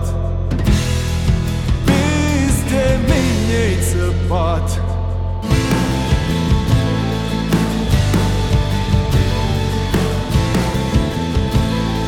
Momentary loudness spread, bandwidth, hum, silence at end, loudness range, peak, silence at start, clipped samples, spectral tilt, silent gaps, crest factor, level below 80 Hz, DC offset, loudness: 4 LU; 17 kHz; none; 0 s; 1 LU; -2 dBFS; 0 s; under 0.1%; -6 dB/octave; none; 14 dB; -22 dBFS; under 0.1%; -17 LUFS